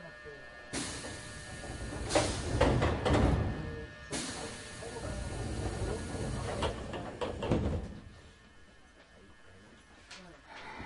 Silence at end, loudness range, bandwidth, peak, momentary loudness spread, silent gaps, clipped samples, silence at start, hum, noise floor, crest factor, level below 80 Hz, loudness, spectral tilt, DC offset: 0 s; 8 LU; 11.5 kHz; -12 dBFS; 19 LU; none; under 0.1%; 0 s; none; -58 dBFS; 22 dB; -42 dBFS; -35 LUFS; -5 dB/octave; under 0.1%